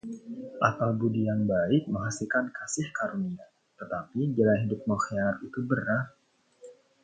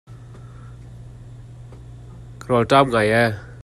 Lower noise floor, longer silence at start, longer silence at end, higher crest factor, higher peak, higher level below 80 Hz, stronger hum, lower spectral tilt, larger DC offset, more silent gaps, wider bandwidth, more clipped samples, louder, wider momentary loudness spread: first, -54 dBFS vs -39 dBFS; about the same, 0.05 s vs 0.1 s; first, 0.3 s vs 0 s; about the same, 22 dB vs 22 dB; second, -6 dBFS vs -2 dBFS; second, -60 dBFS vs -46 dBFS; neither; about the same, -6.5 dB/octave vs -6 dB/octave; neither; neither; second, 9.4 kHz vs 13 kHz; neither; second, -29 LUFS vs -18 LUFS; second, 12 LU vs 25 LU